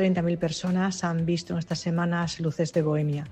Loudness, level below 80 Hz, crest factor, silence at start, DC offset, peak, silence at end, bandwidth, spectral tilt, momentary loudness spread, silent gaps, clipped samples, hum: -27 LUFS; -56 dBFS; 14 dB; 0 s; under 0.1%; -12 dBFS; 0 s; 8.8 kHz; -6 dB/octave; 4 LU; none; under 0.1%; none